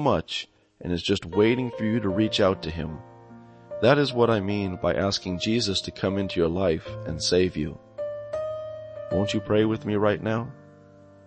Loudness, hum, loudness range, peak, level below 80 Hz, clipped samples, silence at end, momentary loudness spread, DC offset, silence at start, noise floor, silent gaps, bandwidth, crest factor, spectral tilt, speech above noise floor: -25 LUFS; none; 3 LU; -6 dBFS; -50 dBFS; under 0.1%; 0.55 s; 13 LU; under 0.1%; 0 s; -51 dBFS; none; 8.8 kHz; 20 dB; -5.5 dB/octave; 26 dB